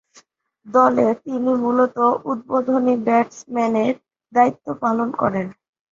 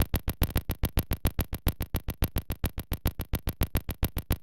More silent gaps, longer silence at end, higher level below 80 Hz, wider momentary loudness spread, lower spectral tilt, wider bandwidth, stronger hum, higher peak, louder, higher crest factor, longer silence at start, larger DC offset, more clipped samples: neither; first, 0.4 s vs 0 s; second, -62 dBFS vs -32 dBFS; first, 8 LU vs 4 LU; first, -7 dB/octave vs -5.5 dB/octave; second, 7.4 kHz vs 17 kHz; neither; first, -2 dBFS vs -10 dBFS; first, -19 LUFS vs -32 LUFS; about the same, 18 dB vs 20 dB; first, 0.65 s vs 0 s; neither; neither